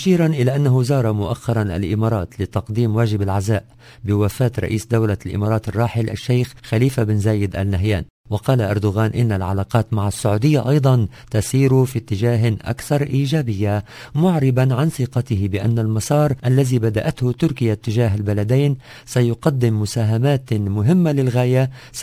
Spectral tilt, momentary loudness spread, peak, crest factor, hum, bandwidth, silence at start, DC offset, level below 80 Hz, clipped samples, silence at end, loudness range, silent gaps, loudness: -7 dB/octave; 6 LU; 0 dBFS; 18 dB; none; 16 kHz; 0 s; under 0.1%; -38 dBFS; under 0.1%; 0 s; 2 LU; 8.10-8.24 s; -19 LUFS